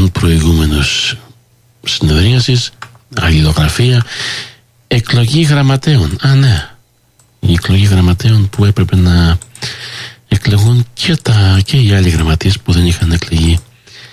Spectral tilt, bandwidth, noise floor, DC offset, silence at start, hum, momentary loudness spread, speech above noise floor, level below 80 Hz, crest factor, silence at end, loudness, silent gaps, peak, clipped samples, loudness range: -5.5 dB/octave; 14.5 kHz; -51 dBFS; under 0.1%; 0 s; none; 10 LU; 41 dB; -20 dBFS; 10 dB; 0.05 s; -11 LUFS; none; 0 dBFS; under 0.1%; 2 LU